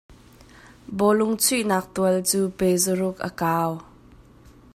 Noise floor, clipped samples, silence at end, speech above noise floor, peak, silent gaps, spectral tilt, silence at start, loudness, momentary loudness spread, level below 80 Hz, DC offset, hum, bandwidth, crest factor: -50 dBFS; under 0.1%; 0.9 s; 28 dB; -8 dBFS; none; -4 dB/octave; 0.1 s; -22 LUFS; 8 LU; -54 dBFS; under 0.1%; none; 16 kHz; 18 dB